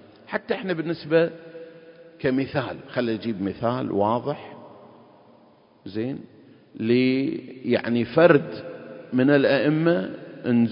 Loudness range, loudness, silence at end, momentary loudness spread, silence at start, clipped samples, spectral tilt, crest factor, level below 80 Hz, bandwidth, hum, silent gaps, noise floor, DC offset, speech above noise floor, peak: 7 LU; -23 LUFS; 0 s; 19 LU; 0.3 s; under 0.1%; -11.5 dB/octave; 22 dB; -62 dBFS; 5.4 kHz; none; none; -55 dBFS; under 0.1%; 33 dB; -2 dBFS